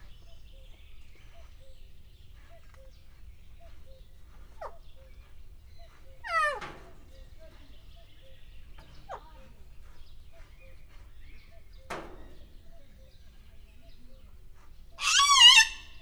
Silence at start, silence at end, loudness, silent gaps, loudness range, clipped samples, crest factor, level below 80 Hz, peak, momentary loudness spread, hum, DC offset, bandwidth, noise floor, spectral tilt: 0.05 s; 0.05 s; -19 LUFS; none; 25 LU; under 0.1%; 26 dB; -50 dBFS; -6 dBFS; 32 LU; none; under 0.1%; over 20 kHz; -50 dBFS; 1.5 dB/octave